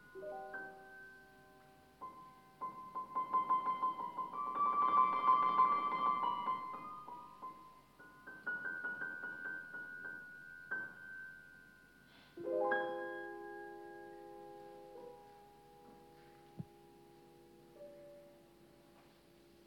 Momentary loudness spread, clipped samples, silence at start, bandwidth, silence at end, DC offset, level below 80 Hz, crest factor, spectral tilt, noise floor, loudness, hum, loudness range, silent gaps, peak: 26 LU; under 0.1%; 0 s; 16 kHz; 0.6 s; under 0.1%; -80 dBFS; 20 dB; -5.5 dB/octave; -65 dBFS; -38 LUFS; none; 24 LU; none; -20 dBFS